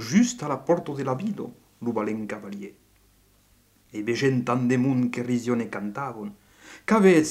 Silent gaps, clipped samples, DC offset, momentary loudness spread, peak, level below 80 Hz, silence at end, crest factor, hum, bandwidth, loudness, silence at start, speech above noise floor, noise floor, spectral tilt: none; under 0.1%; under 0.1%; 17 LU; -6 dBFS; -64 dBFS; 0 s; 20 dB; 50 Hz at -55 dBFS; 13.5 kHz; -25 LUFS; 0 s; 36 dB; -61 dBFS; -6 dB/octave